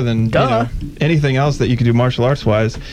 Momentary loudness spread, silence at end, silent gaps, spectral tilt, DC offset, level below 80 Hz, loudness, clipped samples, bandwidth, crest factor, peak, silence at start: 4 LU; 0 s; none; -7 dB/octave; under 0.1%; -32 dBFS; -16 LUFS; under 0.1%; 9.4 kHz; 12 dB; -2 dBFS; 0 s